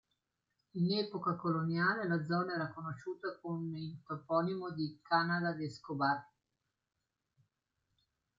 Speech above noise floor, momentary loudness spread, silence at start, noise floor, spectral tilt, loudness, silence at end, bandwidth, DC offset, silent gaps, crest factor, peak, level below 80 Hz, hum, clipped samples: 49 dB; 10 LU; 0.75 s; -85 dBFS; -7.5 dB/octave; -36 LUFS; 2.15 s; 7.6 kHz; under 0.1%; none; 20 dB; -18 dBFS; -78 dBFS; none; under 0.1%